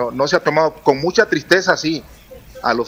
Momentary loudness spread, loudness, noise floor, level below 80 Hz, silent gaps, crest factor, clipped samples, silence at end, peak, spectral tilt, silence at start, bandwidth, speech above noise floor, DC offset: 8 LU; -16 LUFS; -36 dBFS; -48 dBFS; none; 16 dB; under 0.1%; 0 s; 0 dBFS; -4 dB/octave; 0 s; 16 kHz; 19 dB; under 0.1%